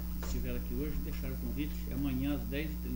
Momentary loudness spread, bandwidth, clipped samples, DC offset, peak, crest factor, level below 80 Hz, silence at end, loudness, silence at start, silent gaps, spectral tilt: 4 LU; 16.5 kHz; under 0.1%; under 0.1%; -24 dBFS; 12 dB; -38 dBFS; 0 s; -37 LUFS; 0 s; none; -6.5 dB/octave